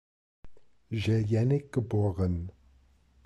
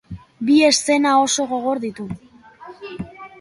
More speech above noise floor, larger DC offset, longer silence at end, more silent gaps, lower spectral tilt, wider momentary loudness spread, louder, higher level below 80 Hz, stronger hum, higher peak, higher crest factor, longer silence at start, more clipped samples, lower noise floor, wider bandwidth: first, 35 dB vs 24 dB; neither; first, 0.75 s vs 0.15 s; neither; first, -8.5 dB/octave vs -3 dB/octave; second, 10 LU vs 21 LU; second, -29 LUFS vs -17 LUFS; about the same, -52 dBFS vs -52 dBFS; neither; second, -16 dBFS vs -2 dBFS; about the same, 14 dB vs 18 dB; first, 0.45 s vs 0.1 s; neither; first, -62 dBFS vs -42 dBFS; second, 8.6 kHz vs 11.5 kHz